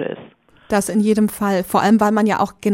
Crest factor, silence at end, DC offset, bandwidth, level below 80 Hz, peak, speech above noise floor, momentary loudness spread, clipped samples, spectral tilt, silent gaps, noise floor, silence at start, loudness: 14 dB; 0 s; under 0.1%; 17 kHz; -52 dBFS; -4 dBFS; 29 dB; 7 LU; under 0.1%; -5.5 dB/octave; none; -45 dBFS; 0 s; -17 LUFS